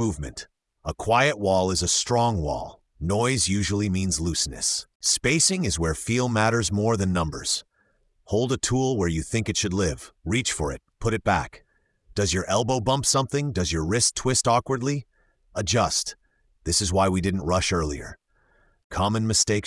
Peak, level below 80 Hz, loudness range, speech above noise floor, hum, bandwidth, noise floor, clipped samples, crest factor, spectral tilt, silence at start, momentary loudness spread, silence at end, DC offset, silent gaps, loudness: -6 dBFS; -44 dBFS; 3 LU; 43 dB; none; 12 kHz; -67 dBFS; under 0.1%; 18 dB; -4 dB/octave; 0 s; 11 LU; 0 s; under 0.1%; 4.95-5.00 s, 18.84-18.90 s; -24 LUFS